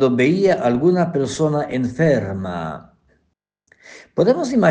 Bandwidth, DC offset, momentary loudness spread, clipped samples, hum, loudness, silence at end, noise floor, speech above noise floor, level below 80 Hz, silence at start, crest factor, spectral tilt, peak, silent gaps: 9.6 kHz; under 0.1%; 12 LU; under 0.1%; none; -18 LUFS; 0 s; -70 dBFS; 52 dB; -54 dBFS; 0 s; 16 dB; -7 dB/octave; -2 dBFS; none